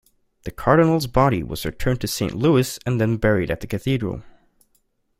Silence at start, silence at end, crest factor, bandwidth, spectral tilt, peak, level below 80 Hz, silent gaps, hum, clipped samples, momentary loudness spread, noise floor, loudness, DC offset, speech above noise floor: 0.45 s; 0.9 s; 20 dB; 16.5 kHz; -6 dB/octave; -2 dBFS; -38 dBFS; none; none; under 0.1%; 12 LU; -66 dBFS; -21 LUFS; under 0.1%; 46 dB